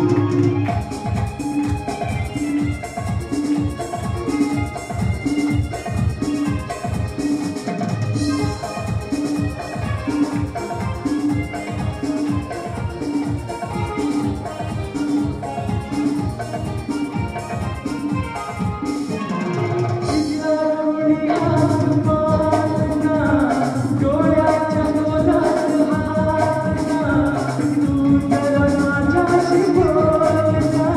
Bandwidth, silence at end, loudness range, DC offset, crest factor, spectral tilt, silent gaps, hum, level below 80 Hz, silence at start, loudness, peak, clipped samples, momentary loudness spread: 12.5 kHz; 0 s; 6 LU; under 0.1%; 16 dB; -7 dB/octave; none; none; -36 dBFS; 0 s; -20 LUFS; -4 dBFS; under 0.1%; 9 LU